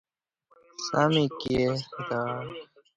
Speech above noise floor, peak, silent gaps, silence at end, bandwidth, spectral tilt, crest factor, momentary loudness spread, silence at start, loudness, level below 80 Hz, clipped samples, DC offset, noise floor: 41 dB; -8 dBFS; none; 0.35 s; 9.2 kHz; -5.5 dB/octave; 20 dB; 16 LU; 0.8 s; -28 LUFS; -56 dBFS; under 0.1%; under 0.1%; -68 dBFS